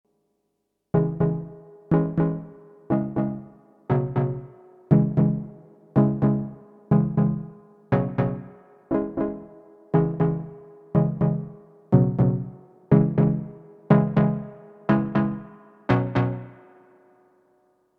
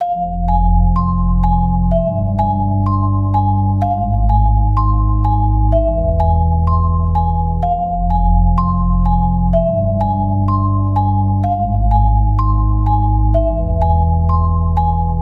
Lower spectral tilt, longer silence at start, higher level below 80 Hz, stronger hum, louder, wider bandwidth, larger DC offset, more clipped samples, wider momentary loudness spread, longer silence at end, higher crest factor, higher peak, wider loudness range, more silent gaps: about the same, -11.5 dB/octave vs -12 dB/octave; first, 0.95 s vs 0 s; second, -50 dBFS vs -16 dBFS; first, 50 Hz at -55 dBFS vs none; second, -24 LUFS vs -15 LUFS; first, 4.6 kHz vs 4.1 kHz; neither; neither; first, 16 LU vs 2 LU; first, 1.45 s vs 0 s; first, 22 dB vs 12 dB; about the same, -2 dBFS vs -2 dBFS; first, 4 LU vs 1 LU; neither